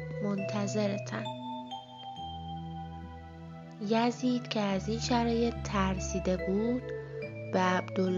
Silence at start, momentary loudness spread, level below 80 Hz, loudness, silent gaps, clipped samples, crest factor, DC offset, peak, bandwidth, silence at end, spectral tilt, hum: 0 s; 14 LU; -48 dBFS; -32 LUFS; none; under 0.1%; 18 dB; under 0.1%; -14 dBFS; 7.8 kHz; 0 s; -5.5 dB/octave; none